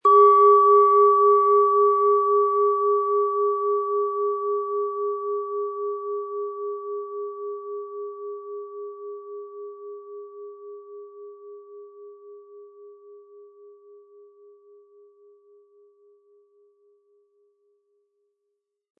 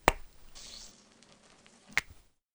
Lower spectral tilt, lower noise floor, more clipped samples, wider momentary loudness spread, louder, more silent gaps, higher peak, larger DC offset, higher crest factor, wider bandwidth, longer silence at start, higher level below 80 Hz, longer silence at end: first, -6.5 dB/octave vs -3 dB/octave; first, -79 dBFS vs -60 dBFS; neither; about the same, 26 LU vs 24 LU; first, -20 LUFS vs -36 LUFS; neither; second, -6 dBFS vs -2 dBFS; neither; second, 18 dB vs 34 dB; second, 3.5 kHz vs over 20 kHz; about the same, 0.05 s vs 0.05 s; second, under -90 dBFS vs -48 dBFS; first, 5.8 s vs 0.5 s